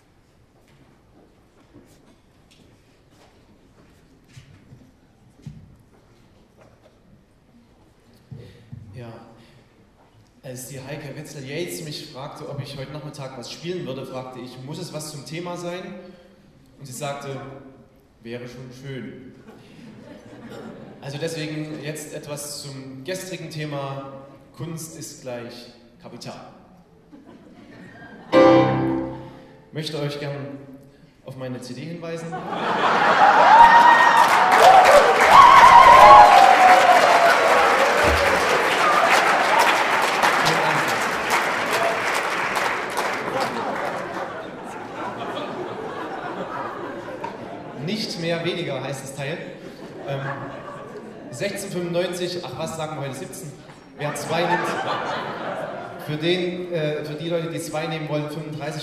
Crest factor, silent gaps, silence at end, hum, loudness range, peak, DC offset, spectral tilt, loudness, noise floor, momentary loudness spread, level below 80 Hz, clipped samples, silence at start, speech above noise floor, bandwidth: 20 dB; none; 0 s; none; 25 LU; 0 dBFS; under 0.1%; -4 dB/octave; -17 LUFS; -56 dBFS; 24 LU; -50 dBFS; under 0.1%; 5.45 s; 32 dB; 15.5 kHz